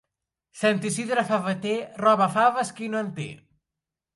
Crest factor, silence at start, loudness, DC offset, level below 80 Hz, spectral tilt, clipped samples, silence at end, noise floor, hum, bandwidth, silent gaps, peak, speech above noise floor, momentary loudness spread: 18 dB; 0.55 s; -24 LUFS; under 0.1%; -70 dBFS; -4.5 dB/octave; under 0.1%; 0.8 s; -87 dBFS; none; 11.5 kHz; none; -8 dBFS; 63 dB; 10 LU